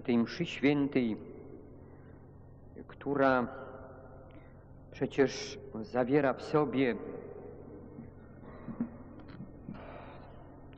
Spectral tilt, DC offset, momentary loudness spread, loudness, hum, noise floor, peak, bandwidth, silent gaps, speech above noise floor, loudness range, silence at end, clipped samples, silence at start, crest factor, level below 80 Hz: -5 dB/octave; under 0.1%; 24 LU; -32 LUFS; none; -53 dBFS; -16 dBFS; 8 kHz; none; 22 dB; 12 LU; 0 s; under 0.1%; 0 s; 20 dB; -60 dBFS